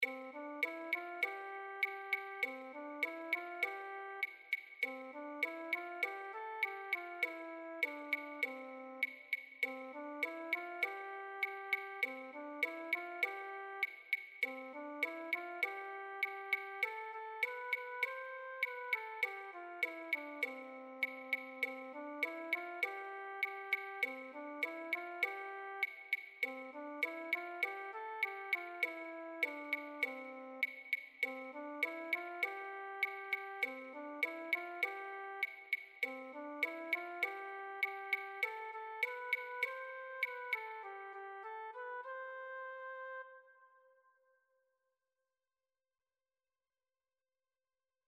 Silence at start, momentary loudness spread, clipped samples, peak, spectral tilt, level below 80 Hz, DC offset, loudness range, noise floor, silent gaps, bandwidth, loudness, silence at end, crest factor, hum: 0 s; 10 LU; under 0.1%; -22 dBFS; -1.5 dB/octave; under -90 dBFS; under 0.1%; 2 LU; under -90 dBFS; none; 13 kHz; -41 LUFS; 4.2 s; 20 dB; none